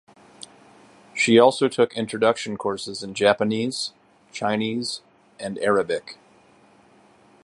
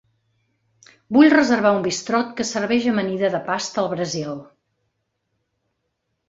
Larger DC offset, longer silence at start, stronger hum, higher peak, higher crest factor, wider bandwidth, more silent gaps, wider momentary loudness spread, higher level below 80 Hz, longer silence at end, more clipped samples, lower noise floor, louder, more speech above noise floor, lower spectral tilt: neither; about the same, 1.15 s vs 1.1 s; neither; about the same, -2 dBFS vs -2 dBFS; about the same, 22 dB vs 20 dB; first, 11.5 kHz vs 7.8 kHz; neither; first, 20 LU vs 12 LU; about the same, -66 dBFS vs -62 dBFS; second, 1.3 s vs 1.85 s; neither; second, -55 dBFS vs -75 dBFS; second, -22 LUFS vs -19 LUFS; second, 33 dB vs 56 dB; about the same, -4 dB/octave vs -4.5 dB/octave